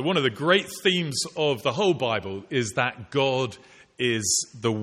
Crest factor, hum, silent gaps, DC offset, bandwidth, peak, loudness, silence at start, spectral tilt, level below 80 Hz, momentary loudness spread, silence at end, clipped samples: 20 dB; none; none; under 0.1%; 15.5 kHz; -6 dBFS; -24 LUFS; 0 s; -3.5 dB/octave; -64 dBFS; 6 LU; 0 s; under 0.1%